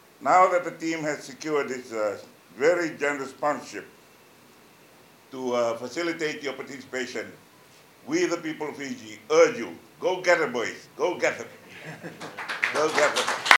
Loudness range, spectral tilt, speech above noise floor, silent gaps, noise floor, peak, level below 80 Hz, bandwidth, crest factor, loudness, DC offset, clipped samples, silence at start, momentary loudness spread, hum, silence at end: 6 LU; -3 dB/octave; 28 dB; none; -54 dBFS; 0 dBFS; -74 dBFS; 17 kHz; 26 dB; -26 LUFS; under 0.1%; under 0.1%; 0.2 s; 17 LU; none; 0 s